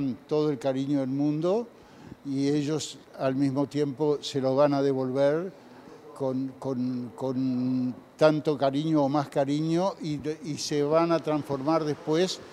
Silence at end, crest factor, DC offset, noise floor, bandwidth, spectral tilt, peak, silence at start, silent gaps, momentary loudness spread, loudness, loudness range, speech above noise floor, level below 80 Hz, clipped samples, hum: 0 s; 20 dB; under 0.1%; -48 dBFS; 13 kHz; -6.5 dB/octave; -6 dBFS; 0 s; none; 9 LU; -27 LUFS; 2 LU; 21 dB; -70 dBFS; under 0.1%; none